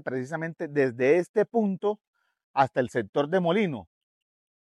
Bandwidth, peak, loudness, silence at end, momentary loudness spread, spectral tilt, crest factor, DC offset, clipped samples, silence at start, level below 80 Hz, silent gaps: 11.5 kHz; -8 dBFS; -26 LUFS; 0.8 s; 9 LU; -7 dB/octave; 20 dB; under 0.1%; under 0.1%; 0.05 s; -76 dBFS; 1.29-1.34 s, 2.07-2.13 s, 2.44-2.54 s, 3.09-3.13 s